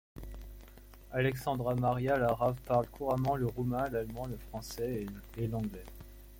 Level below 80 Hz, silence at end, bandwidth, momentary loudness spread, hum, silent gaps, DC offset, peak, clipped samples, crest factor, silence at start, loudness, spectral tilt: -50 dBFS; 0 s; 17 kHz; 19 LU; none; none; under 0.1%; -16 dBFS; under 0.1%; 18 dB; 0.15 s; -34 LUFS; -7 dB/octave